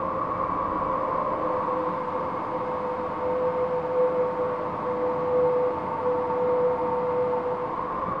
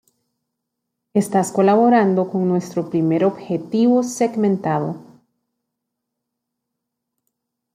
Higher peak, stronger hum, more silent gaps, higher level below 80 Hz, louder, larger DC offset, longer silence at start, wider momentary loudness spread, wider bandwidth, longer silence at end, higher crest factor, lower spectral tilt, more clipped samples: second, -14 dBFS vs -4 dBFS; neither; neither; first, -54 dBFS vs -68 dBFS; second, -26 LUFS vs -18 LUFS; first, 0.1% vs under 0.1%; second, 0 s vs 1.15 s; second, 5 LU vs 9 LU; second, 5.4 kHz vs 15 kHz; second, 0 s vs 2.75 s; about the same, 12 dB vs 16 dB; first, -8.5 dB/octave vs -7 dB/octave; neither